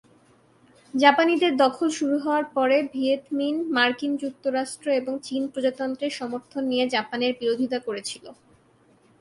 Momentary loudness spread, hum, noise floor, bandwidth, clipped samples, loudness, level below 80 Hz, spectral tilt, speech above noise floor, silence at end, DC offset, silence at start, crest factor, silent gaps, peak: 10 LU; none; -59 dBFS; 11.5 kHz; under 0.1%; -24 LUFS; -72 dBFS; -3 dB/octave; 35 dB; 0.85 s; under 0.1%; 0.95 s; 22 dB; none; -2 dBFS